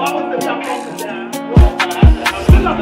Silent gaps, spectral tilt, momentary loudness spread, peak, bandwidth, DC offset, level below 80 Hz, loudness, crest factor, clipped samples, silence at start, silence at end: none; -6 dB/octave; 12 LU; 0 dBFS; 16 kHz; under 0.1%; -16 dBFS; -14 LUFS; 12 dB; 0.3%; 0 s; 0 s